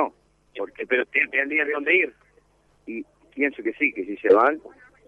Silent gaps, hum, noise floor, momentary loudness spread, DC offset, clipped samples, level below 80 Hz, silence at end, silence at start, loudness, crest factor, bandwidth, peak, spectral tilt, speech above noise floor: none; 50 Hz at -65 dBFS; -61 dBFS; 18 LU; under 0.1%; under 0.1%; -68 dBFS; 0.4 s; 0 s; -22 LUFS; 20 dB; 5 kHz; -6 dBFS; -5.5 dB/octave; 38 dB